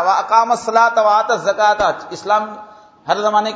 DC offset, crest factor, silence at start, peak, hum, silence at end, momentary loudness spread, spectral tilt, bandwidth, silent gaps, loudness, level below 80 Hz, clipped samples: under 0.1%; 16 dB; 0 s; 0 dBFS; none; 0 s; 13 LU; -3 dB/octave; 8 kHz; none; -15 LUFS; -54 dBFS; under 0.1%